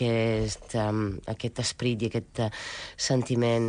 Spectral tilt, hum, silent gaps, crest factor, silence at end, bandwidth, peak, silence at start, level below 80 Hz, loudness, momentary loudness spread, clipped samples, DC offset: -5 dB/octave; none; none; 14 dB; 0 s; 10 kHz; -14 dBFS; 0 s; -50 dBFS; -29 LUFS; 8 LU; under 0.1%; under 0.1%